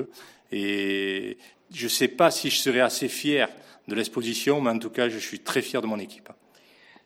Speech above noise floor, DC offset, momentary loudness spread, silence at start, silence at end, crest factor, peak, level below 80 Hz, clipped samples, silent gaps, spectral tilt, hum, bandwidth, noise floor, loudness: 30 dB; under 0.1%; 14 LU; 0 s; 0.75 s; 20 dB; -6 dBFS; -74 dBFS; under 0.1%; none; -3 dB/octave; none; 17 kHz; -56 dBFS; -25 LUFS